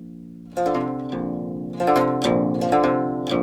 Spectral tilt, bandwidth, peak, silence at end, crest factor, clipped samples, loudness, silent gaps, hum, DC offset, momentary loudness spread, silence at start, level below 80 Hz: -6.5 dB/octave; 15.5 kHz; -6 dBFS; 0 s; 16 dB; under 0.1%; -22 LUFS; none; none; under 0.1%; 11 LU; 0 s; -52 dBFS